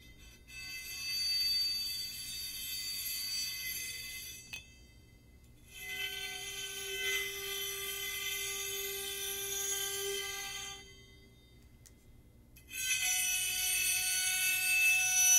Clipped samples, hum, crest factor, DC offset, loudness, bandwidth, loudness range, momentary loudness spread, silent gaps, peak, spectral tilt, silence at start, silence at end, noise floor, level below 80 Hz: under 0.1%; 60 Hz at -65 dBFS; 22 dB; under 0.1%; -33 LUFS; 16 kHz; 8 LU; 14 LU; none; -14 dBFS; 1.5 dB/octave; 0 s; 0 s; -59 dBFS; -62 dBFS